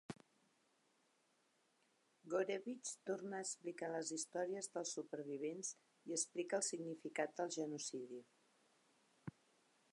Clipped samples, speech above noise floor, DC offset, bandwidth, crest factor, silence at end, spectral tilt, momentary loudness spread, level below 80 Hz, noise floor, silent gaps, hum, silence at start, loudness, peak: under 0.1%; 35 dB; under 0.1%; 11.5 kHz; 20 dB; 0.6 s; -3 dB/octave; 15 LU; under -90 dBFS; -80 dBFS; none; none; 0.1 s; -45 LUFS; -26 dBFS